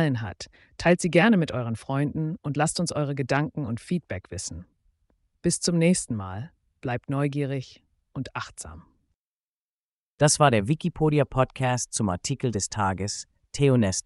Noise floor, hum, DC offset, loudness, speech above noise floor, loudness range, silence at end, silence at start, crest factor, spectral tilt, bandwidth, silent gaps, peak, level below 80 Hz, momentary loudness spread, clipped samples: under -90 dBFS; none; under 0.1%; -25 LUFS; over 65 dB; 8 LU; 0.05 s; 0 s; 22 dB; -5 dB/octave; 11.5 kHz; 9.15-10.18 s; -4 dBFS; -52 dBFS; 16 LU; under 0.1%